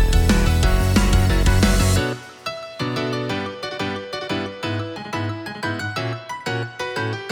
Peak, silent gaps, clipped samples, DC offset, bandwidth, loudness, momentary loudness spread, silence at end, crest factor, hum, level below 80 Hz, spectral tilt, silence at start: -2 dBFS; none; under 0.1%; under 0.1%; 20 kHz; -22 LUFS; 11 LU; 0 s; 18 dB; none; -24 dBFS; -5 dB/octave; 0 s